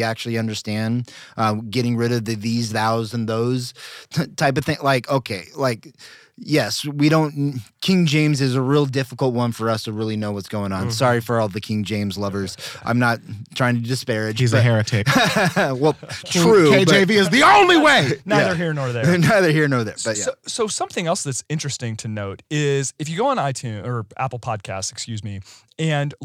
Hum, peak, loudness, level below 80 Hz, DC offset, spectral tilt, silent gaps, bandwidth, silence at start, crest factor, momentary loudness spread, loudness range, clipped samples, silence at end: none; -4 dBFS; -19 LUFS; -58 dBFS; under 0.1%; -5 dB/octave; none; 16 kHz; 0 s; 16 dB; 13 LU; 9 LU; under 0.1%; 0 s